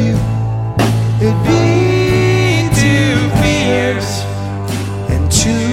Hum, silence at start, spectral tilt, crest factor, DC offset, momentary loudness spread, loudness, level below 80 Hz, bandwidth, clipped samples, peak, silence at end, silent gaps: none; 0 s; -5.5 dB/octave; 12 dB; 0.2%; 8 LU; -13 LUFS; -28 dBFS; 15.5 kHz; under 0.1%; 0 dBFS; 0 s; none